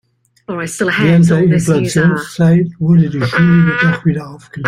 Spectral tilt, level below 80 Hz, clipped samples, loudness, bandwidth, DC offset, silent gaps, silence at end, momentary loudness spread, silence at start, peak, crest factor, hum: -6.5 dB/octave; -46 dBFS; under 0.1%; -12 LUFS; 12.5 kHz; under 0.1%; none; 0 s; 12 LU; 0.5 s; 0 dBFS; 12 dB; none